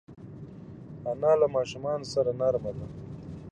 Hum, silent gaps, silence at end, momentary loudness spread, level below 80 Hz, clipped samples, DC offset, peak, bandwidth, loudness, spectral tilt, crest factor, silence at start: none; none; 0 s; 21 LU; -56 dBFS; under 0.1%; under 0.1%; -10 dBFS; 9.4 kHz; -28 LUFS; -6.5 dB/octave; 18 dB; 0.1 s